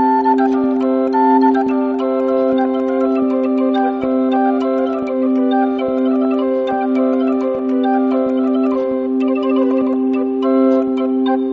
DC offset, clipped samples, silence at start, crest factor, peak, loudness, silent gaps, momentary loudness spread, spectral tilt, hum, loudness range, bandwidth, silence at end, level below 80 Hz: under 0.1%; under 0.1%; 0 s; 12 dB; -2 dBFS; -16 LUFS; none; 4 LU; -4 dB/octave; none; 1 LU; 4.7 kHz; 0 s; -56 dBFS